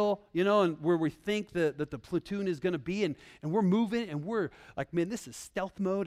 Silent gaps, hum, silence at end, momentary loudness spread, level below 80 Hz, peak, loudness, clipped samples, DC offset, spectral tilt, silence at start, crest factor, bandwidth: none; none; 0 s; 10 LU; -64 dBFS; -14 dBFS; -32 LUFS; under 0.1%; under 0.1%; -6.5 dB/octave; 0 s; 16 dB; 14.5 kHz